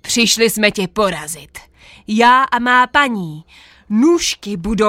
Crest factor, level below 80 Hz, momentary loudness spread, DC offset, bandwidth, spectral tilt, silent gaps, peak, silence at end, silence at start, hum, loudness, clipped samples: 16 dB; -42 dBFS; 14 LU; under 0.1%; 16.5 kHz; -3 dB/octave; none; 0 dBFS; 0 s; 0.05 s; none; -14 LUFS; under 0.1%